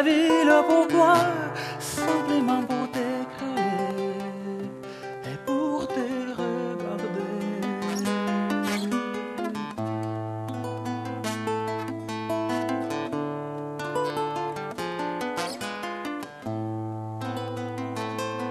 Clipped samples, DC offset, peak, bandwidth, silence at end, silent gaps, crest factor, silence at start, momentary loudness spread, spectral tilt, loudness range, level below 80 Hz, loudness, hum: under 0.1%; under 0.1%; -6 dBFS; 14 kHz; 0 s; none; 20 dB; 0 s; 13 LU; -5.5 dB/octave; 7 LU; -66 dBFS; -27 LUFS; none